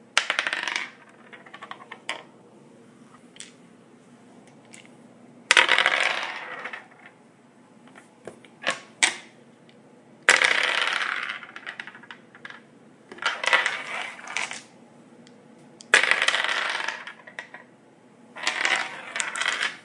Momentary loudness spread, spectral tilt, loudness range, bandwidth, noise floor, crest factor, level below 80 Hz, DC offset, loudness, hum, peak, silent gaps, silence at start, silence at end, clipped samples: 25 LU; 0.5 dB/octave; 11 LU; 11.5 kHz; -54 dBFS; 28 dB; -80 dBFS; under 0.1%; -23 LUFS; none; 0 dBFS; none; 0.15 s; 0.05 s; under 0.1%